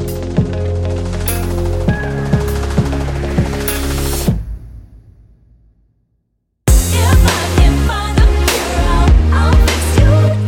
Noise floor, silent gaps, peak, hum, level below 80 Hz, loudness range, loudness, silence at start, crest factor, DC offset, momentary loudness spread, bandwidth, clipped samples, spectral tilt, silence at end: -66 dBFS; none; 0 dBFS; none; -16 dBFS; 8 LU; -14 LUFS; 0 s; 12 dB; under 0.1%; 7 LU; 17.5 kHz; under 0.1%; -5.5 dB/octave; 0 s